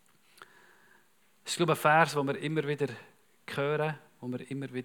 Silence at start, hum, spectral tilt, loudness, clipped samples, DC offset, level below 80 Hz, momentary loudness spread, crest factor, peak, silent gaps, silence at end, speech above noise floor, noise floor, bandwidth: 0.4 s; none; -5 dB/octave; -30 LUFS; under 0.1%; under 0.1%; -90 dBFS; 18 LU; 24 dB; -8 dBFS; none; 0 s; 37 dB; -67 dBFS; 19.5 kHz